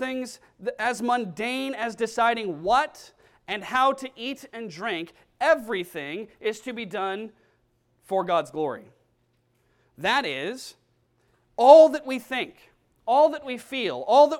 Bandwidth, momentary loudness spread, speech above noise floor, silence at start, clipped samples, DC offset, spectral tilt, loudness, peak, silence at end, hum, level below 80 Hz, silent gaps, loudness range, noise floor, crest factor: 14.5 kHz; 15 LU; 45 dB; 0 s; under 0.1%; under 0.1%; -4 dB/octave; -24 LUFS; -2 dBFS; 0 s; none; -66 dBFS; none; 10 LU; -69 dBFS; 24 dB